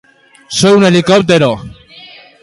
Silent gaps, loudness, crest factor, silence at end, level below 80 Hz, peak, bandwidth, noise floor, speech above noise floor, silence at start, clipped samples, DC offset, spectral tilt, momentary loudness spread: none; -9 LUFS; 12 dB; 0.75 s; -46 dBFS; 0 dBFS; 11.5 kHz; -37 dBFS; 28 dB; 0.5 s; under 0.1%; under 0.1%; -5 dB/octave; 10 LU